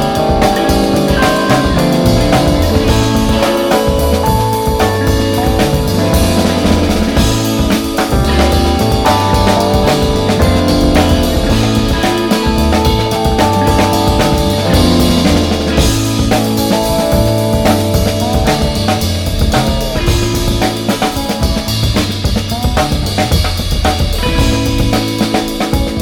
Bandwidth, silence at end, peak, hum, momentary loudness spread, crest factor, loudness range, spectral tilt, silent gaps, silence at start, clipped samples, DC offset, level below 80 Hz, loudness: 18.5 kHz; 0 s; 0 dBFS; none; 4 LU; 12 dB; 3 LU; -5.5 dB/octave; none; 0 s; under 0.1%; under 0.1%; -18 dBFS; -12 LUFS